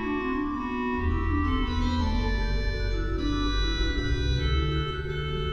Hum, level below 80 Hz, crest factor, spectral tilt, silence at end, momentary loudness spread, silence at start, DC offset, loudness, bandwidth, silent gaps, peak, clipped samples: none; -30 dBFS; 12 dB; -6.5 dB/octave; 0 s; 3 LU; 0 s; under 0.1%; -28 LUFS; 7.2 kHz; none; -14 dBFS; under 0.1%